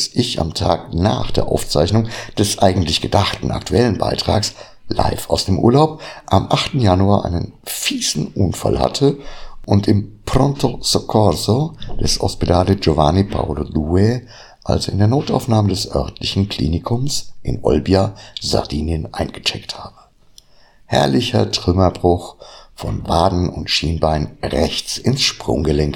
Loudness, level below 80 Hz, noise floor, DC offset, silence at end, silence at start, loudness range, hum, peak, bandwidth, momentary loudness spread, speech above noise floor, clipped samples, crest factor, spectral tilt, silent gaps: -17 LUFS; -32 dBFS; -48 dBFS; under 0.1%; 0 s; 0 s; 3 LU; none; 0 dBFS; 17 kHz; 8 LU; 31 dB; under 0.1%; 18 dB; -5.5 dB/octave; none